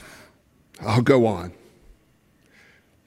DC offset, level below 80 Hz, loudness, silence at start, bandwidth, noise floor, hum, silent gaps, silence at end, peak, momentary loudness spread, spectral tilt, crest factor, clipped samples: under 0.1%; -58 dBFS; -21 LUFS; 0.8 s; 15.5 kHz; -61 dBFS; none; none; 1.55 s; -4 dBFS; 16 LU; -7 dB/octave; 22 dB; under 0.1%